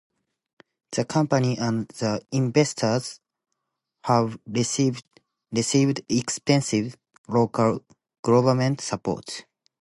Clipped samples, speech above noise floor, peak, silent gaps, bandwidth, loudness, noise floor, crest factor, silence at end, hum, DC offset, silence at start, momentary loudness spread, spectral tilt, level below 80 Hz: under 0.1%; 57 dB; -6 dBFS; 7.18-7.24 s, 8.19-8.23 s; 11.5 kHz; -24 LUFS; -80 dBFS; 18 dB; 0.4 s; none; under 0.1%; 0.9 s; 10 LU; -5.5 dB/octave; -62 dBFS